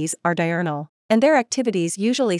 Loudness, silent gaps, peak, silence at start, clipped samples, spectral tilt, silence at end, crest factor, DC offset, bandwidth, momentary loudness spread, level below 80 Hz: -20 LUFS; 0.89-1.09 s; -4 dBFS; 0 s; under 0.1%; -4.5 dB/octave; 0 s; 16 dB; under 0.1%; 12 kHz; 8 LU; -74 dBFS